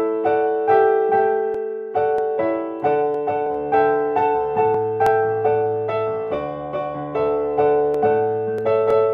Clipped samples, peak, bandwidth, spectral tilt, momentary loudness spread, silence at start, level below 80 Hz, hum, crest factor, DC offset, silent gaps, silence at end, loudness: under 0.1%; -4 dBFS; 4.8 kHz; -8 dB/octave; 7 LU; 0 s; -54 dBFS; none; 16 dB; under 0.1%; none; 0 s; -20 LUFS